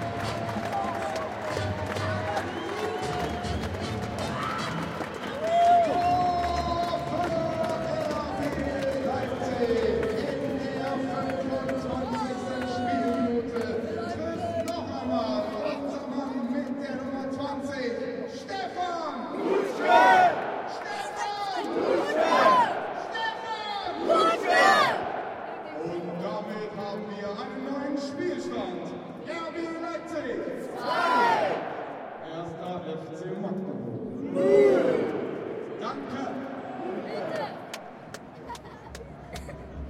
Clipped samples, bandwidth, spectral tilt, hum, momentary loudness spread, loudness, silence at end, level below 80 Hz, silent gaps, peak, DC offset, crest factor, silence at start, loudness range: under 0.1%; 16 kHz; -5.5 dB/octave; none; 14 LU; -28 LUFS; 0 s; -54 dBFS; none; -6 dBFS; under 0.1%; 22 dB; 0 s; 9 LU